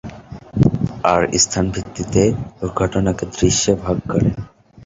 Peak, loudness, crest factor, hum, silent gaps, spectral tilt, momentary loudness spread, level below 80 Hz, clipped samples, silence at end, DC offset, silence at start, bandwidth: -2 dBFS; -18 LUFS; 18 dB; none; none; -5 dB/octave; 12 LU; -36 dBFS; under 0.1%; 0.05 s; under 0.1%; 0.05 s; 8 kHz